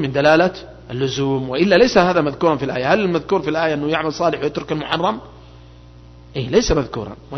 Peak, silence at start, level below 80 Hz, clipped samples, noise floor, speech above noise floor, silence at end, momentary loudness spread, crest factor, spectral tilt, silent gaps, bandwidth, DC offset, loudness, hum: 0 dBFS; 0 s; -40 dBFS; under 0.1%; -42 dBFS; 24 dB; 0 s; 13 LU; 18 dB; -5.5 dB/octave; none; 6.4 kHz; under 0.1%; -18 LUFS; 60 Hz at -45 dBFS